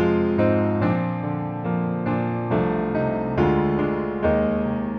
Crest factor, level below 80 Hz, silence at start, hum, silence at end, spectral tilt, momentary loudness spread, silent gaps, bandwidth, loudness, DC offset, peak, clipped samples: 14 dB; -42 dBFS; 0 s; none; 0 s; -10.5 dB/octave; 5 LU; none; 5.6 kHz; -23 LUFS; under 0.1%; -8 dBFS; under 0.1%